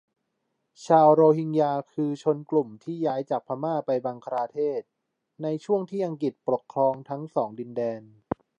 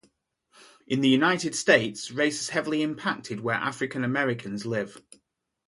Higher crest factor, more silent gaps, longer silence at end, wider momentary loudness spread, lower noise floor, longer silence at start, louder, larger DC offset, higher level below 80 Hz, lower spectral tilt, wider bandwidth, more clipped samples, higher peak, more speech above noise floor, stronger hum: about the same, 20 dB vs 22 dB; neither; second, 0.55 s vs 0.7 s; first, 14 LU vs 10 LU; first, -78 dBFS vs -69 dBFS; about the same, 0.8 s vs 0.9 s; about the same, -26 LUFS vs -26 LUFS; neither; about the same, -68 dBFS vs -70 dBFS; first, -8 dB/octave vs -4 dB/octave; second, 8.4 kHz vs 11.5 kHz; neither; about the same, -6 dBFS vs -6 dBFS; first, 53 dB vs 43 dB; neither